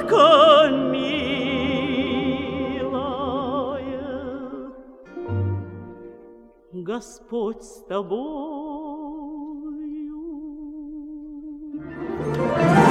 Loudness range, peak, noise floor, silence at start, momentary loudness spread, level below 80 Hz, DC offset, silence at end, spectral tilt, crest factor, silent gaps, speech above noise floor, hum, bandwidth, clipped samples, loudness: 12 LU; -2 dBFS; -48 dBFS; 0 s; 21 LU; -50 dBFS; under 0.1%; 0 s; -6 dB/octave; 20 dB; none; 27 dB; none; 12.5 kHz; under 0.1%; -22 LUFS